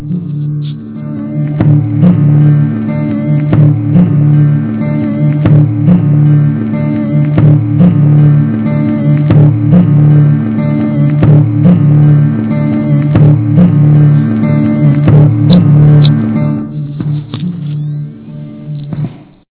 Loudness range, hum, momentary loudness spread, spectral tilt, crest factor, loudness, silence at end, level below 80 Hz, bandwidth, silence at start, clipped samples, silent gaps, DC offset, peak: 3 LU; none; 12 LU; -13 dB/octave; 8 dB; -8 LUFS; 0.35 s; -34 dBFS; 4 kHz; 0 s; 2%; none; under 0.1%; 0 dBFS